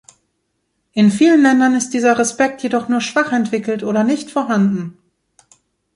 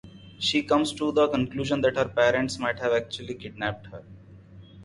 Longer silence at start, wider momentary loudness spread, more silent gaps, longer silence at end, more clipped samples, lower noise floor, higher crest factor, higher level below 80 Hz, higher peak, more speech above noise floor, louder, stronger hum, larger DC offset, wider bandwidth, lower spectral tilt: first, 0.95 s vs 0.05 s; second, 9 LU vs 13 LU; neither; first, 1.05 s vs 0 s; neither; first, -69 dBFS vs -48 dBFS; second, 14 dB vs 20 dB; second, -62 dBFS vs -54 dBFS; first, -2 dBFS vs -6 dBFS; first, 55 dB vs 23 dB; first, -16 LUFS vs -25 LUFS; neither; neither; about the same, 11.5 kHz vs 11.5 kHz; about the same, -5 dB/octave vs -4.5 dB/octave